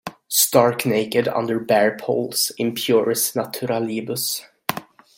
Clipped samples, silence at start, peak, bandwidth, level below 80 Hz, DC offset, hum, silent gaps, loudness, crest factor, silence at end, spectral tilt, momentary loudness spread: under 0.1%; 0.05 s; 0 dBFS; 17 kHz; -64 dBFS; under 0.1%; none; none; -20 LUFS; 20 dB; 0.35 s; -3.5 dB/octave; 9 LU